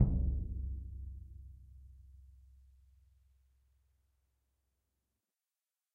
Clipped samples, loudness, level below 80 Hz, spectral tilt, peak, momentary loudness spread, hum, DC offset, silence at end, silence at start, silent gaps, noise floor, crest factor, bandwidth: under 0.1%; -40 LUFS; -44 dBFS; -12.5 dB/octave; -16 dBFS; 24 LU; none; under 0.1%; 3.65 s; 0 s; none; under -90 dBFS; 26 dB; 1.4 kHz